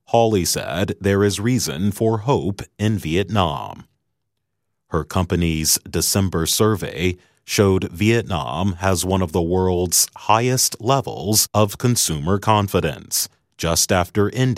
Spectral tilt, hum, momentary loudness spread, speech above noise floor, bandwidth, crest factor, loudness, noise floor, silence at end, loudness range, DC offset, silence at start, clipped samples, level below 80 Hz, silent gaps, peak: -4 dB/octave; none; 7 LU; 58 dB; 16 kHz; 20 dB; -19 LUFS; -77 dBFS; 0 s; 4 LU; under 0.1%; 0.1 s; under 0.1%; -42 dBFS; none; 0 dBFS